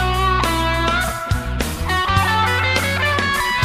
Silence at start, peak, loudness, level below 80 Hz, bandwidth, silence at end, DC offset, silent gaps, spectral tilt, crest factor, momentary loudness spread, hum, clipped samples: 0 s; -2 dBFS; -18 LUFS; -28 dBFS; 15.5 kHz; 0 s; under 0.1%; none; -4 dB/octave; 16 dB; 6 LU; none; under 0.1%